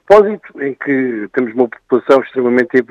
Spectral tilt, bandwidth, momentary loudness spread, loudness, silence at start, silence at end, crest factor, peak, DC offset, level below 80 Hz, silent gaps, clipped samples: -7 dB/octave; 7.8 kHz; 10 LU; -14 LUFS; 0.1 s; 0.05 s; 14 dB; 0 dBFS; under 0.1%; -50 dBFS; none; 0.2%